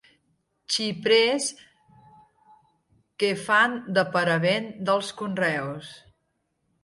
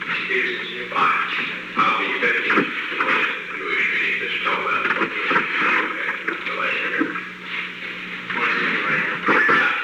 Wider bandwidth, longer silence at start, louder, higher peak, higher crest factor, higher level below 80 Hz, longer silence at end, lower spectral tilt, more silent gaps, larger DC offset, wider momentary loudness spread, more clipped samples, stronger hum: second, 11.5 kHz vs 18.5 kHz; first, 0.7 s vs 0 s; second, -24 LUFS vs -20 LUFS; second, -8 dBFS vs -4 dBFS; about the same, 20 dB vs 18 dB; about the same, -70 dBFS vs -66 dBFS; first, 0.85 s vs 0 s; about the same, -3.5 dB/octave vs -4 dB/octave; neither; neither; first, 11 LU vs 8 LU; neither; neither